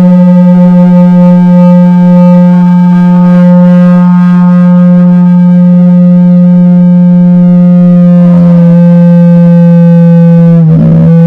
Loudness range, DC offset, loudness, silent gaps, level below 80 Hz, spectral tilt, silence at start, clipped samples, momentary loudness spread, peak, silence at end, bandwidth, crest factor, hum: 1 LU; under 0.1%; -3 LUFS; none; -40 dBFS; -11.5 dB/octave; 0 s; 30%; 1 LU; 0 dBFS; 0 s; 3.2 kHz; 2 dB; none